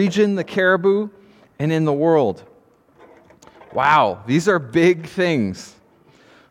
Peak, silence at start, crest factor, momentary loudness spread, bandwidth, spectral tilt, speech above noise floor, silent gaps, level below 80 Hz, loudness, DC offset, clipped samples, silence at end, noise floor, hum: -2 dBFS; 0 s; 18 dB; 10 LU; 13 kHz; -6.5 dB/octave; 36 dB; none; -62 dBFS; -18 LUFS; under 0.1%; under 0.1%; 0.8 s; -53 dBFS; none